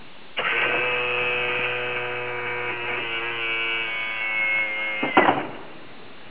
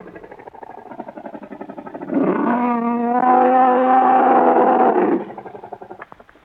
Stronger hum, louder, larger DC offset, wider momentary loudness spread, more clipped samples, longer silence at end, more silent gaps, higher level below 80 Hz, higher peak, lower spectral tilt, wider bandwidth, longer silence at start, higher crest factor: neither; second, -23 LUFS vs -15 LUFS; first, 1% vs under 0.1%; second, 12 LU vs 23 LU; neither; second, 0 s vs 0.4 s; neither; about the same, -62 dBFS vs -66 dBFS; second, -6 dBFS vs -2 dBFS; second, -0.5 dB/octave vs -9 dB/octave; about the same, 4 kHz vs 4 kHz; about the same, 0 s vs 0.05 s; about the same, 20 dB vs 16 dB